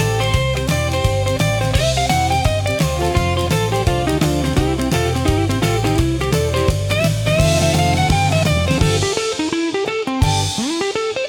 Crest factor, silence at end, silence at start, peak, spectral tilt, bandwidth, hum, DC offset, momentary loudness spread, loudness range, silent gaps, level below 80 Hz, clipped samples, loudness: 14 dB; 0 s; 0 s; -2 dBFS; -5 dB/octave; 18 kHz; none; under 0.1%; 4 LU; 1 LU; none; -28 dBFS; under 0.1%; -17 LUFS